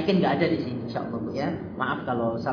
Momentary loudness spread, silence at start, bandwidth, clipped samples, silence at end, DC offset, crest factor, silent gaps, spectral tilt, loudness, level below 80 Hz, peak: 8 LU; 0 s; 5.4 kHz; under 0.1%; 0 s; under 0.1%; 16 dB; none; -8 dB/octave; -27 LUFS; -58 dBFS; -10 dBFS